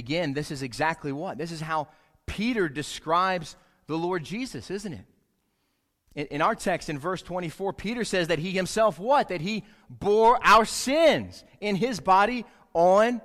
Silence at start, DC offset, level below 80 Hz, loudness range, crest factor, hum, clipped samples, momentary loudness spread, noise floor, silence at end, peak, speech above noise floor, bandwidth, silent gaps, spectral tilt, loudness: 0 s; under 0.1%; -54 dBFS; 9 LU; 20 dB; none; under 0.1%; 15 LU; -74 dBFS; 0.05 s; -6 dBFS; 49 dB; 15.5 kHz; none; -4.5 dB/octave; -25 LUFS